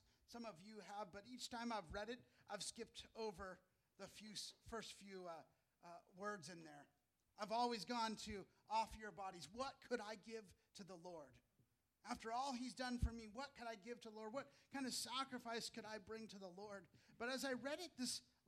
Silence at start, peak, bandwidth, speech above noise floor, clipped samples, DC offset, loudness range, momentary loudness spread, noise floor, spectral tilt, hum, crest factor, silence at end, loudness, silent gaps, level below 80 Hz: 0.3 s; -30 dBFS; 15 kHz; 32 dB; under 0.1%; under 0.1%; 7 LU; 14 LU; -83 dBFS; -3.5 dB/octave; none; 22 dB; 0.25 s; -50 LUFS; none; -66 dBFS